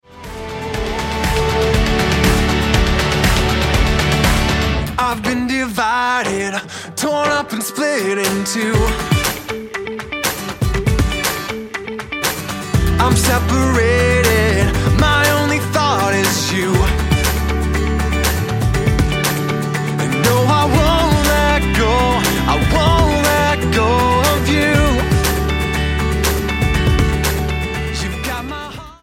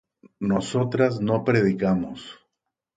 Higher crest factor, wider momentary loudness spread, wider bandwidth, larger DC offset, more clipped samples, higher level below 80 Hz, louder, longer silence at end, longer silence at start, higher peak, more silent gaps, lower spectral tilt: about the same, 14 dB vs 18 dB; second, 8 LU vs 13 LU; first, 17 kHz vs 9.4 kHz; neither; neither; first, -22 dBFS vs -56 dBFS; first, -16 LUFS vs -23 LUFS; second, 0.1 s vs 0.6 s; second, 0.1 s vs 0.4 s; first, -2 dBFS vs -6 dBFS; neither; second, -4.5 dB/octave vs -7 dB/octave